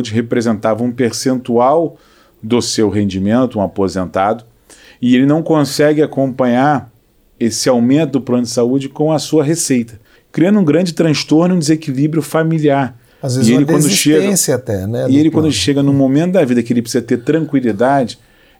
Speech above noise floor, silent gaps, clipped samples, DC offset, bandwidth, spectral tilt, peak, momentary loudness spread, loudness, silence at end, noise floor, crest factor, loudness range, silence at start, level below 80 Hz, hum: 30 dB; none; under 0.1%; under 0.1%; 17 kHz; -5.5 dB/octave; -2 dBFS; 6 LU; -14 LUFS; 0.45 s; -43 dBFS; 12 dB; 3 LU; 0 s; -52 dBFS; none